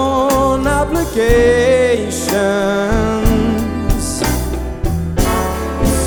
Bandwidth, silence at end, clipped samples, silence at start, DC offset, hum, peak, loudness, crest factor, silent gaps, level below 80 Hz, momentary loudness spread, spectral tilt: over 20 kHz; 0 s; under 0.1%; 0 s; under 0.1%; none; 0 dBFS; -15 LUFS; 14 dB; none; -22 dBFS; 8 LU; -5 dB/octave